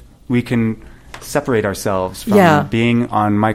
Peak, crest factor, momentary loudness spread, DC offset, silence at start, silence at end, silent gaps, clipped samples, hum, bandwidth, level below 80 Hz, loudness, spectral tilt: 0 dBFS; 16 dB; 10 LU; under 0.1%; 0.3 s; 0 s; none; under 0.1%; none; 16.5 kHz; -42 dBFS; -16 LUFS; -6.5 dB/octave